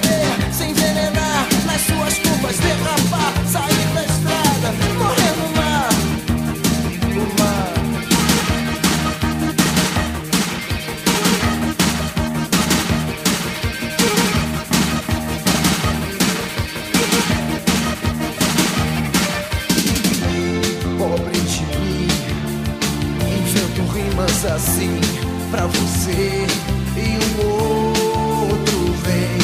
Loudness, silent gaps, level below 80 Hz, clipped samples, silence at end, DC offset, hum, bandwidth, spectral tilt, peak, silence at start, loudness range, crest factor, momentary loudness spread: -18 LUFS; none; -32 dBFS; under 0.1%; 0 s; under 0.1%; none; 15.5 kHz; -4 dB/octave; -2 dBFS; 0 s; 2 LU; 16 dB; 5 LU